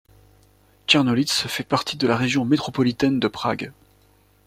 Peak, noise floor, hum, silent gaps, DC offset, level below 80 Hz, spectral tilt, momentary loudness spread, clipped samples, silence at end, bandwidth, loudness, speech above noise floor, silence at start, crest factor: -2 dBFS; -58 dBFS; 50 Hz at -50 dBFS; none; under 0.1%; -56 dBFS; -4.5 dB/octave; 9 LU; under 0.1%; 0.75 s; 16 kHz; -21 LUFS; 36 dB; 0.9 s; 20 dB